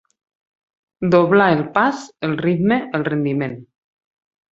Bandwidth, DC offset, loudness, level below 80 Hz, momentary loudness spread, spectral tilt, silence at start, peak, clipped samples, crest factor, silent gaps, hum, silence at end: 8 kHz; under 0.1%; -18 LUFS; -56 dBFS; 11 LU; -7.5 dB/octave; 1 s; -2 dBFS; under 0.1%; 18 dB; none; none; 0.9 s